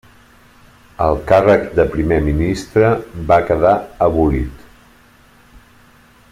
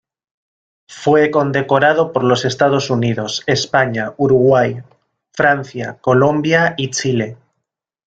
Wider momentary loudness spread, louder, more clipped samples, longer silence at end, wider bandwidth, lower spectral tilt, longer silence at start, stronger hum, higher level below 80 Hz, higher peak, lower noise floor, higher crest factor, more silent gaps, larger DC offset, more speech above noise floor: about the same, 7 LU vs 8 LU; about the same, -15 LUFS vs -15 LUFS; neither; first, 1.75 s vs 0.75 s; first, 15 kHz vs 9 kHz; first, -7.5 dB/octave vs -5 dB/octave; about the same, 1 s vs 0.9 s; neither; first, -32 dBFS vs -52 dBFS; about the same, 0 dBFS vs 0 dBFS; second, -48 dBFS vs -77 dBFS; about the same, 16 dB vs 16 dB; neither; neither; second, 34 dB vs 62 dB